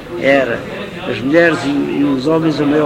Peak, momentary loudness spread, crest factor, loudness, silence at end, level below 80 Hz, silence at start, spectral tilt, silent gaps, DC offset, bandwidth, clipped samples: 0 dBFS; 11 LU; 14 dB; -14 LUFS; 0 s; -44 dBFS; 0 s; -6.5 dB/octave; none; under 0.1%; 11 kHz; under 0.1%